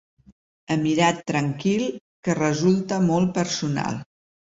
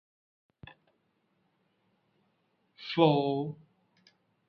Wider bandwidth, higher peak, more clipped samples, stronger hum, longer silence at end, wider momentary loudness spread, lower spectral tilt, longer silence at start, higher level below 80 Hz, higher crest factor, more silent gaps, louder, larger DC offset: first, 8 kHz vs 6.2 kHz; about the same, -6 dBFS vs -8 dBFS; neither; neither; second, 0.55 s vs 0.95 s; second, 9 LU vs 21 LU; second, -5.5 dB/octave vs -8.5 dB/octave; second, 0.7 s vs 2.8 s; first, -58 dBFS vs -74 dBFS; second, 18 dB vs 26 dB; first, 2.01-2.23 s vs none; first, -23 LUFS vs -28 LUFS; neither